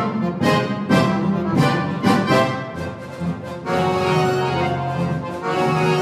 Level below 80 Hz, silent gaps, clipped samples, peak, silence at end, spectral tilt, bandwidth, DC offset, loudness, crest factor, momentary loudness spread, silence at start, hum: -50 dBFS; none; under 0.1%; -4 dBFS; 0 s; -6.5 dB/octave; 15 kHz; under 0.1%; -20 LUFS; 16 dB; 10 LU; 0 s; none